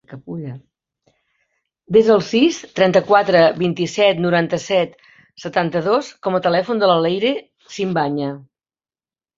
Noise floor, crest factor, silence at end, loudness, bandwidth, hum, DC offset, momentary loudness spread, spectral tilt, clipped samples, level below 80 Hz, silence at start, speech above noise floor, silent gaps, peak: under -90 dBFS; 16 dB; 0.95 s; -17 LUFS; 7.8 kHz; none; under 0.1%; 16 LU; -5.5 dB/octave; under 0.1%; -60 dBFS; 0.1 s; over 73 dB; none; -2 dBFS